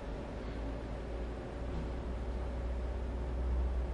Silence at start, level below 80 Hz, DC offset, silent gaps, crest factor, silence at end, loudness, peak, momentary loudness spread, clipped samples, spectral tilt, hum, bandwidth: 0 s; -38 dBFS; under 0.1%; none; 12 dB; 0 s; -40 LUFS; -26 dBFS; 6 LU; under 0.1%; -8 dB/octave; none; 7.6 kHz